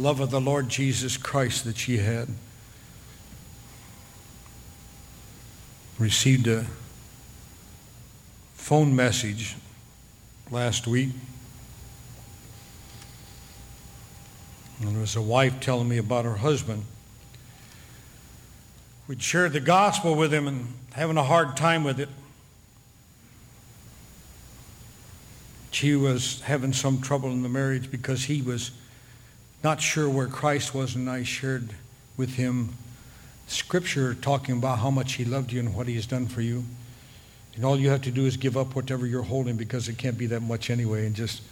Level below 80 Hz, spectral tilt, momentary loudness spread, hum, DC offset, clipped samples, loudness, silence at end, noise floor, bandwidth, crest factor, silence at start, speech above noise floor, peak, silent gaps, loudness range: -54 dBFS; -5 dB/octave; 24 LU; none; under 0.1%; under 0.1%; -26 LUFS; 0 s; -54 dBFS; 19.5 kHz; 22 dB; 0 s; 29 dB; -6 dBFS; none; 8 LU